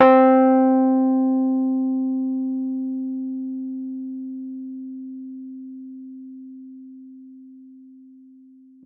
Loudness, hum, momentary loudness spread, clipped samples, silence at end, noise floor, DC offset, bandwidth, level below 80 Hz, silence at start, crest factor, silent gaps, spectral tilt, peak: -21 LUFS; none; 24 LU; under 0.1%; 1.05 s; -49 dBFS; under 0.1%; 4.1 kHz; -74 dBFS; 0 s; 20 dB; none; -8.5 dB/octave; -2 dBFS